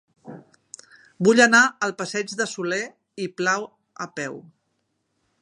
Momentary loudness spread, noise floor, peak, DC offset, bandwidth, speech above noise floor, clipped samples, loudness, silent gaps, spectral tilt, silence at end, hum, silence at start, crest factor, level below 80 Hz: 20 LU; -73 dBFS; -2 dBFS; under 0.1%; 11.5 kHz; 52 dB; under 0.1%; -21 LUFS; none; -3.5 dB/octave; 1 s; none; 0.25 s; 22 dB; -72 dBFS